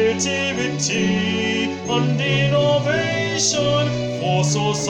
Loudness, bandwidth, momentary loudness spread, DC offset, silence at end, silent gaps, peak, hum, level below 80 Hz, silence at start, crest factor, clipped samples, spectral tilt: -19 LUFS; 10.5 kHz; 4 LU; under 0.1%; 0 s; none; -6 dBFS; none; -50 dBFS; 0 s; 14 dB; under 0.1%; -4 dB/octave